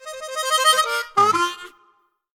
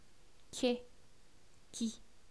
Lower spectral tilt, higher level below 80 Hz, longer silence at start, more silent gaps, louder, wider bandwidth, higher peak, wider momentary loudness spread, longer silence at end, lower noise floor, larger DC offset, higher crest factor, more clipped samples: second, -0.5 dB/octave vs -3.5 dB/octave; about the same, -66 dBFS vs -68 dBFS; second, 0 s vs 0.55 s; neither; first, -19 LUFS vs -40 LUFS; first, 19.5 kHz vs 11 kHz; first, -2 dBFS vs -20 dBFS; about the same, 12 LU vs 14 LU; first, 0.7 s vs 0.25 s; second, -61 dBFS vs -65 dBFS; second, under 0.1% vs 0.2%; second, 18 dB vs 24 dB; neither